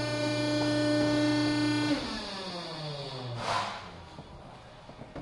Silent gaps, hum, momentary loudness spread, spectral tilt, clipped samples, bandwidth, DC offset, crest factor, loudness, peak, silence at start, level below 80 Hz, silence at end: none; none; 21 LU; -5 dB/octave; under 0.1%; 11.5 kHz; under 0.1%; 14 dB; -30 LUFS; -16 dBFS; 0 s; -56 dBFS; 0 s